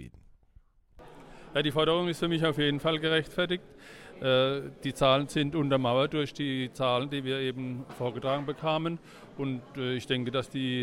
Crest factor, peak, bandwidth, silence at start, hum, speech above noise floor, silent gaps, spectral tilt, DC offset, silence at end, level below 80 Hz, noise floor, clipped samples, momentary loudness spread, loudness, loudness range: 20 dB; -10 dBFS; 16 kHz; 0 s; none; 31 dB; none; -6 dB/octave; under 0.1%; 0 s; -58 dBFS; -60 dBFS; under 0.1%; 10 LU; -29 LUFS; 4 LU